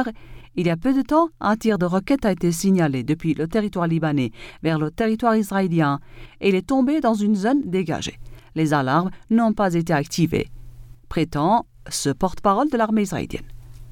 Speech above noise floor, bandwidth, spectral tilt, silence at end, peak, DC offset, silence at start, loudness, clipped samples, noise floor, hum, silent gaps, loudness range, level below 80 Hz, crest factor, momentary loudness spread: 19 dB; 17.5 kHz; -6 dB/octave; 0 s; -6 dBFS; under 0.1%; 0 s; -21 LUFS; under 0.1%; -40 dBFS; none; none; 2 LU; -44 dBFS; 16 dB; 9 LU